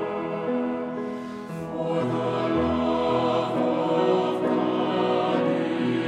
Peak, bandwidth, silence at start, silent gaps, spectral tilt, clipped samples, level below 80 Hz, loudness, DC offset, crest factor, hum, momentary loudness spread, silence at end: -10 dBFS; 10 kHz; 0 s; none; -7 dB/octave; under 0.1%; -54 dBFS; -25 LUFS; under 0.1%; 14 dB; none; 8 LU; 0 s